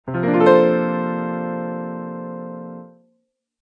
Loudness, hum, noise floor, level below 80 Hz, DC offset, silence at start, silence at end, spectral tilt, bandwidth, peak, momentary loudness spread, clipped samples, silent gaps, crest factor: -19 LUFS; none; -69 dBFS; -64 dBFS; under 0.1%; 0.05 s; 0.75 s; -9 dB/octave; 7.4 kHz; -2 dBFS; 20 LU; under 0.1%; none; 20 dB